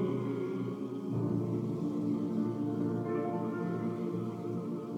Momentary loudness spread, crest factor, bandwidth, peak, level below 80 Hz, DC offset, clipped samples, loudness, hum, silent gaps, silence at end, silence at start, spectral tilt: 4 LU; 12 dB; 11 kHz; -22 dBFS; -76 dBFS; under 0.1%; under 0.1%; -35 LUFS; none; none; 0 s; 0 s; -9.5 dB/octave